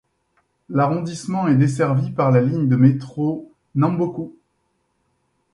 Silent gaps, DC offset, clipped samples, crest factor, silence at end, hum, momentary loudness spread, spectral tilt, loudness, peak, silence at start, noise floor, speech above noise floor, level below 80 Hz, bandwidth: none; under 0.1%; under 0.1%; 18 dB; 1.25 s; none; 10 LU; -8.5 dB/octave; -19 LUFS; -2 dBFS; 0.7 s; -69 dBFS; 51 dB; -58 dBFS; 11 kHz